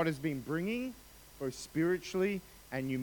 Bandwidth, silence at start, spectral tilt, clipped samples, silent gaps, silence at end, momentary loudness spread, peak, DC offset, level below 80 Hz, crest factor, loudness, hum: 19 kHz; 0 s; -6 dB/octave; under 0.1%; none; 0 s; 10 LU; -18 dBFS; under 0.1%; -62 dBFS; 16 dB; -36 LUFS; none